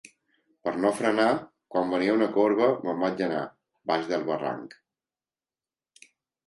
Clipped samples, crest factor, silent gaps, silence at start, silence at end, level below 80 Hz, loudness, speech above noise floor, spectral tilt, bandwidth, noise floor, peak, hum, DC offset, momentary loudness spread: under 0.1%; 18 dB; none; 0.65 s; 1.8 s; -72 dBFS; -26 LUFS; over 65 dB; -5.5 dB/octave; 11.5 kHz; under -90 dBFS; -10 dBFS; none; under 0.1%; 12 LU